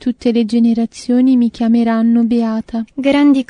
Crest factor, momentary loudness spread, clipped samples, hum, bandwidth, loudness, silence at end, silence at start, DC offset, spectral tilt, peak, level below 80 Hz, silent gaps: 10 dB; 6 LU; under 0.1%; none; 10 kHz; -14 LUFS; 0.05 s; 0 s; under 0.1%; -6.5 dB/octave; -2 dBFS; -50 dBFS; none